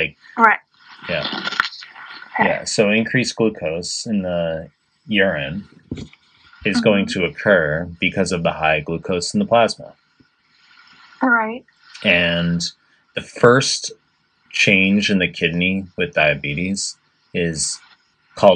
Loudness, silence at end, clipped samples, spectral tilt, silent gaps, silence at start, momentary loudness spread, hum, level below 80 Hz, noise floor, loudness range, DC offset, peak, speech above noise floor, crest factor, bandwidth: -18 LUFS; 0 s; under 0.1%; -4 dB/octave; none; 0 s; 15 LU; none; -52 dBFS; -62 dBFS; 4 LU; under 0.1%; 0 dBFS; 43 dB; 20 dB; 10.5 kHz